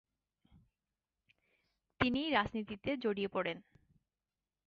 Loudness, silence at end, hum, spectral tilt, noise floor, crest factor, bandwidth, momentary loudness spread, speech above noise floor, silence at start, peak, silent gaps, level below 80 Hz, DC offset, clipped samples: -36 LUFS; 1.05 s; none; -3 dB/octave; under -90 dBFS; 24 dB; 7 kHz; 8 LU; over 54 dB; 2 s; -16 dBFS; none; -64 dBFS; under 0.1%; under 0.1%